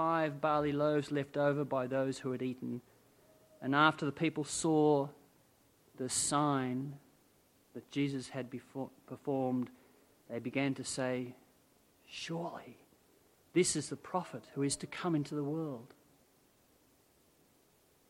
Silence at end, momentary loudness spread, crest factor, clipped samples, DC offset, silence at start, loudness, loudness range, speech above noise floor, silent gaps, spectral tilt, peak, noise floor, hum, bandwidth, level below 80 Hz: 2.25 s; 15 LU; 24 dB; under 0.1%; under 0.1%; 0 s; -35 LUFS; 7 LU; 34 dB; none; -4.5 dB/octave; -12 dBFS; -69 dBFS; none; 16.5 kHz; -72 dBFS